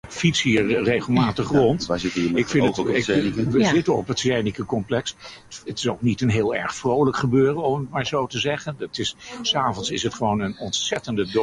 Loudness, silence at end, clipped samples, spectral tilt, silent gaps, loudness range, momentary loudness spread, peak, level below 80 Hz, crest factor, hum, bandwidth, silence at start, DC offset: -22 LUFS; 0 s; under 0.1%; -5 dB/octave; none; 4 LU; 8 LU; -6 dBFS; -50 dBFS; 16 dB; none; 11.5 kHz; 0.05 s; under 0.1%